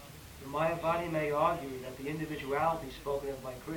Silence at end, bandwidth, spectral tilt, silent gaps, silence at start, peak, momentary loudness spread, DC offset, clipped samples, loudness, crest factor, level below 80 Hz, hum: 0 s; 19.5 kHz; -6 dB/octave; none; 0 s; -16 dBFS; 11 LU; under 0.1%; under 0.1%; -34 LUFS; 18 dB; -56 dBFS; none